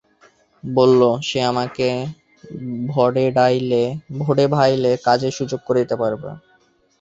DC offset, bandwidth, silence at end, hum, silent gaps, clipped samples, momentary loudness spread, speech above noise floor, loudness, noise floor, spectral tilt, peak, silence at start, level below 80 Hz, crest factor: under 0.1%; 7.8 kHz; 0.65 s; none; none; under 0.1%; 14 LU; 40 dB; -18 LUFS; -58 dBFS; -6.5 dB/octave; -2 dBFS; 0.65 s; -58 dBFS; 18 dB